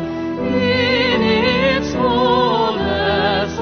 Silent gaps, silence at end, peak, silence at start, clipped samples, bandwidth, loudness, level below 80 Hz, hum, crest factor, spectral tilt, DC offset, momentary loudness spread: none; 0 s; -4 dBFS; 0 s; under 0.1%; 6.6 kHz; -16 LUFS; -36 dBFS; none; 12 dB; -5.5 dB/octave; under 0.1%; 3 LU